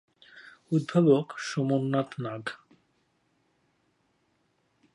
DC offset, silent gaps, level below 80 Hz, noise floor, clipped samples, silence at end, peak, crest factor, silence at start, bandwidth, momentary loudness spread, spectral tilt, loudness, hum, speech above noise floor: under 0.1%; none; -78 dBFS; -72 dBFS; under 0.1%; 2.4 s; -10 dBFS; 20 dB; 0.35 s; 11 kHz; 15 LU; -7 dB/octave; -27 LUFS; none; 46 dB